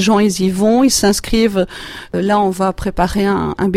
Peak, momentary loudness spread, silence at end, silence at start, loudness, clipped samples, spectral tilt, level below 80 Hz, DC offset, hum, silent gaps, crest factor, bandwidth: -2 dBFS; 8 LU; 0 s; 0 s; -15 LUFS; under 0.1%; -4.5 dB/octave; -32 dBFS; under 0.1%; none; none; 14 dB; 15.5 kHz